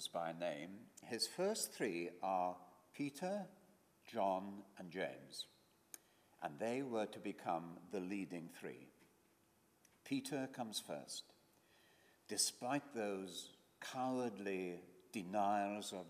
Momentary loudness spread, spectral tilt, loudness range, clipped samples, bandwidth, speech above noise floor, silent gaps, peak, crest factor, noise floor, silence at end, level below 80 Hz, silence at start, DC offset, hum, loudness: 15 LU; -3.5 dB/octave; 5 LU; under 0.1%; 15.5 kHz; 31 dB; none; -22 dBFS; 24 dB; -75 dBFS; 0 s; under -90 dBFS; 0 s; under 0.1%; none; -44 LUFS